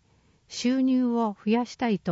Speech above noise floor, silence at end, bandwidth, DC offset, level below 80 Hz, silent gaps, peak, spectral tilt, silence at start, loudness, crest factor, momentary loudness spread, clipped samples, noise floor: 38 dB; 0 s; 8 kHz; under 0.1%; -66 dBFS; none; -12 dBFS; -5.5 dB/octave; 0.5 s; -26 LUFS; 14 dB; 5 LU; under 0.1%; -63 dBFS